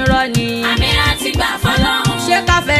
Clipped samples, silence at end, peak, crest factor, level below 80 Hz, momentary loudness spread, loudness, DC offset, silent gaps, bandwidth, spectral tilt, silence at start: under 0.1%; 0 s; 0 dBFS; 14 dB; -26 dBFS; 3 LU; -14 LUFS; under 0.1%; none; 15 kHz; -4 dB/octave; 0 s